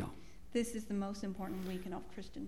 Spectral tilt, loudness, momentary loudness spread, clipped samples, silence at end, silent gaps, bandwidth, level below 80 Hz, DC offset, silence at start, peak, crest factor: -5.5 dB/octave; -42 LUFS; 9 LU; under 0.1%; 0 s; none; 17 kHz; -58 dBFS; 0.3%; 0 s; -22 dBFS; 20 dB